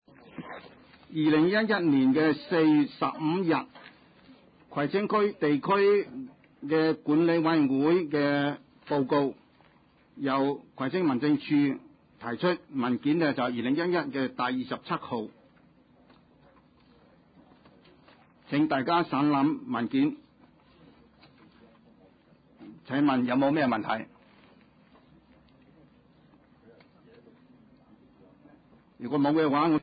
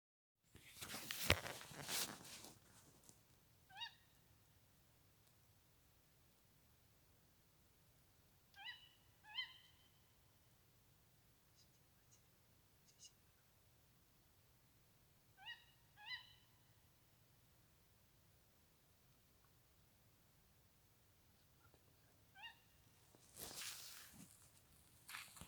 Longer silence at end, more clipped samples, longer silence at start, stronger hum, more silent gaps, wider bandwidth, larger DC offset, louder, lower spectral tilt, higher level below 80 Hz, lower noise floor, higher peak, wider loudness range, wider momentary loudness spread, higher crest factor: about the same, 0 s vs 0 s; neither; second, 0.35 s vs 0.55 s; neither; neither; second, 5 kHz vs over 20 kHz; neither; first, -27 LUFS vs -49 LUFS; first, -10.5 dB/octave vs -2 dB/octave; about the same, -70 dBFS vs -74 dBFS; second, -61 dBFS vs -74 dBFS; about the same, -14 dBFS vs -14 dBFS; second, 10 LU vs 23 LU; second, 14 LU vs 24 LU; second, 16 dB vs 44 dB